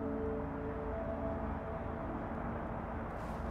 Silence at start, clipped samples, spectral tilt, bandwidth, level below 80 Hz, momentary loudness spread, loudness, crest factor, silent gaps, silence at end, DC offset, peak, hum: 0 s; under 0.1%; -9 dB/octave; 11 kHz; -46 dBFS; 3 LU; -40 LUFS; 12 dB; none; 0 s; under 0.1%; -26 dBFS; none